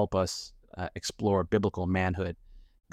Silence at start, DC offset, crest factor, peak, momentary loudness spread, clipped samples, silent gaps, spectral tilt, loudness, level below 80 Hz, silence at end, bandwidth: 0 s; under 0.1%; 18 dB; -12 dBFS; 12 LU; under 0.1%; none; -5.5 dB/octave; -30 LUFS; -50 dBFS; 0.3 s; 14.5 kHz